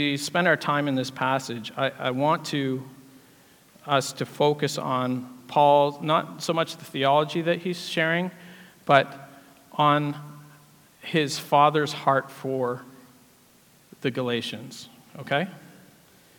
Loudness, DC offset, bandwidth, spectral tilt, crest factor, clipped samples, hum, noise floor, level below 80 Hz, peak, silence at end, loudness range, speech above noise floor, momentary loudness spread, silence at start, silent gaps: -25 LUFS; under 0.1%; 18 kHz; -5 dB/octave; 24 dB; under 0.1%; none; -57 dBFS; -76 dBFS; -2 dBFS; 0.8 s; 6 LU; 33 dB; 16 LU; 0 s; none